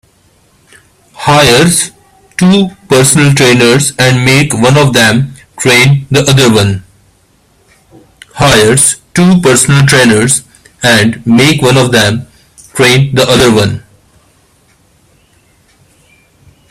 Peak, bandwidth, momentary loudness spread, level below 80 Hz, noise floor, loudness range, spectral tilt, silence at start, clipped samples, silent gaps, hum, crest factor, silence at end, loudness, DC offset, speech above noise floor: 0 dBFS; 15.5 kHz; 8 LU; -38 dBFS; -49 dBFS; 5 LU; -4 dB/octave; 1.2 s; 0.4%; none; none; 8 dB; 2.9 s; -7 LUFS; under 0.1%; 42 dB